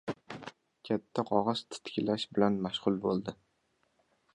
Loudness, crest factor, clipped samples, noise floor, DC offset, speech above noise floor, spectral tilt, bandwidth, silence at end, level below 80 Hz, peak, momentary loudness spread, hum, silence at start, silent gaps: -33 LUFS; 22 dB; under 0.1%; -75 dBFS; under 0.1%; 44 dB; -6 dB/octave; 11 kHz; 1 s; -68 dBFS; -12 dBFS; 15 LU; none; 0.05 s; none